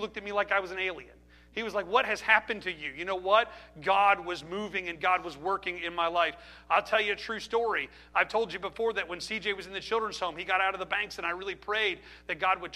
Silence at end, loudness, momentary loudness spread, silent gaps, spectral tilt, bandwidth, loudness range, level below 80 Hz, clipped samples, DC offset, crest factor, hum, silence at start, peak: 0 s; -29 LUFS; 11 LU; none; -3 dB/octave; 14 kHz; 3 LU; -60 dBFS; under 0.1%; under 0.1%; 24 dB; none; 0 s; -8 dBFS